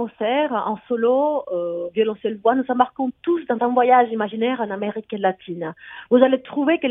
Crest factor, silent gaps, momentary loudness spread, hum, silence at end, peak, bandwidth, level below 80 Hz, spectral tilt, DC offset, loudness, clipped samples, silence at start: 20 dB; none; 10 LU; none; 0 s; 0 dBFS; 3.9 kHz; -68 dBFS; -9 dB/octave; under 0.1%; -21 LUFS; under 0.1%; 0 s